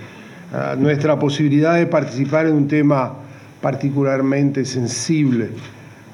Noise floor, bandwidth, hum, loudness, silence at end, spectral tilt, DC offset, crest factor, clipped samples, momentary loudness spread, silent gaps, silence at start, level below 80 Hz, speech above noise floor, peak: -37 dBFS; 11 kHz; none; -18 LUFS; 0 s; -6.5 dB/octave; under 0.1%; 14 dB; under 0.1%; 13 LU; none; 0 s; -66 dBFS; 20 dB; -4 dBFS